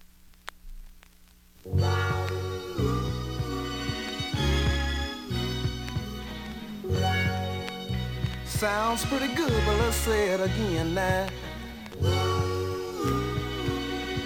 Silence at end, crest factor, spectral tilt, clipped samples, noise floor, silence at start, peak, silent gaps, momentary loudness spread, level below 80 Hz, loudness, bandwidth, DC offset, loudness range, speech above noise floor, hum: 0 s; 16 dB; -5 dB/octave; under 0.1%; -55 dBFS; 0 s; -12 dBFS; none; 12 LU; -38 dBFS; -29 LUFS; 17.5 kHz; under 0.1%; 4 LU; 29 dB; none